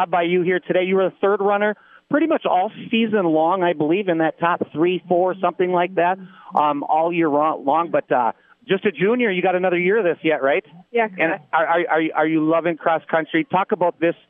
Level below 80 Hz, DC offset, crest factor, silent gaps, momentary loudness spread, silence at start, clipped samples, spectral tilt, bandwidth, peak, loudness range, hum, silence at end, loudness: -80 dBFS; under 0.1%; 16 dB; none; 4 LU; 0 s; under 0.1%; -9.5 dB/octave; 3.8 kHz; -4 dBFS; 1 LU; none; 0.15 s; -20 LUFS